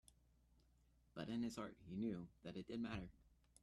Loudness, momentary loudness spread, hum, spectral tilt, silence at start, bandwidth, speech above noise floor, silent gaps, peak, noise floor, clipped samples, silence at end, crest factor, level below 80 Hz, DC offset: -49 LUFS; 8 LU; none; -6 dB/octave; 1.15 s; 12.5 kHz; 27 dB; none; -34 dBFS; -76 dBFS; under 0.1%; 0.35 s; 16 dB; -70 dBFS; under 0.1%